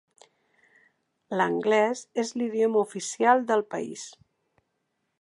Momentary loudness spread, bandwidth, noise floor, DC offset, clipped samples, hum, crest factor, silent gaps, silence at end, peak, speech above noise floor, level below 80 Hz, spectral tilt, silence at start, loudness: 12 LU; 11.5 kHz; -78 dBFS; under 0.1%; under 0.1%; none; 18 dB; none; 1.1 s; -10 dBFS; 52 dB; -82 dBFS; -4 dB/octave; 1.3 s; -26 LUFS